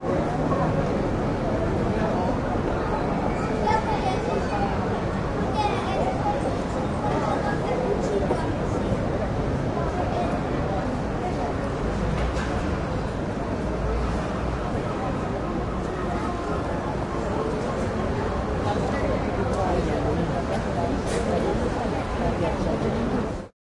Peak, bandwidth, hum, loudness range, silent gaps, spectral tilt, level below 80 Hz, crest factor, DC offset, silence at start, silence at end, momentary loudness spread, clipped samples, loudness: -10 dBFS; 11.5 kHz; none; 3 LU; none; -7 dB/octave; -34 dBFS; 14 dB; under 0.1%; 0 s; 0.15 s; 4 LU; under 0.1%; -26 LUFS